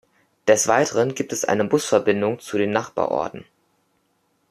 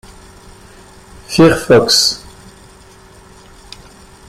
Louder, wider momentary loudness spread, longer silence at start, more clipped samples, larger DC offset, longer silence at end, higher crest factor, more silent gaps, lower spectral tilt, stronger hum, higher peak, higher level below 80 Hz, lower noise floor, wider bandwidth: second, -21 LUFS vs -10 LUFS; second, 8 LU vs 11 LU; second, 0.45 s vs 1.3 s; neither; neither; second, 1.1 s vs 2.1 s; about the same, 20 dB vs 16 dB; neither; about the same, -4 dB/octave vs -4 dB/octave; neither; about the same, -2 dBFS vs 0 dBFS; second, -64 dBFS vs -42 dBFS; first, -67 dBFS vs -41 dBFS; about the same, 14.5 kHz vs 15.5 kHz